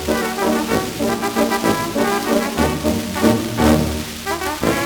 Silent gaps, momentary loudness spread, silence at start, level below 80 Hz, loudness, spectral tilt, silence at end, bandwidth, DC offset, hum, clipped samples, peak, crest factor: none; 6 LU; 0 s; -36 dBFS; -18 LUFS; -4.5 dB/octave; 0 s; over 20 kHz; under 0.1%; none; under 0.1%; 0 dBFS; 18 dB